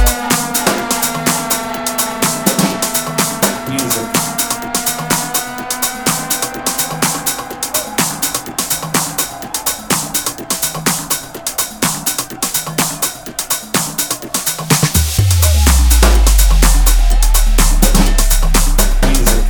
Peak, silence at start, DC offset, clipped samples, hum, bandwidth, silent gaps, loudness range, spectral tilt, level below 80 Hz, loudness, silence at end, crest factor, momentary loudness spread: 0 dBFS; 0 s; under 0.1%; under 0.1%; none; 19.5 kHz; none; 5 LU; -3 dB/octave; -16 dBFS; -14 LUFS; 0 s; 14 dB; 7 LU